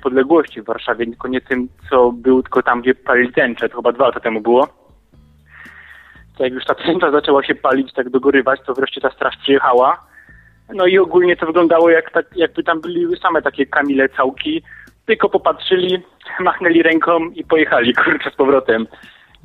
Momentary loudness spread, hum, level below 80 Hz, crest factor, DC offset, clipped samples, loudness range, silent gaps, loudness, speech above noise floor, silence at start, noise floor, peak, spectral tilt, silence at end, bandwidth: 9 LU; none; -52 dBFS; 16 dB; under 0.1%; under 0.1%; 4 LU; none; -15 LUFS; 34 dB; 0.05 s; -49 dBFS; 0 dBFS; -7 dB/octave; 0.6 s; 4.6 kHz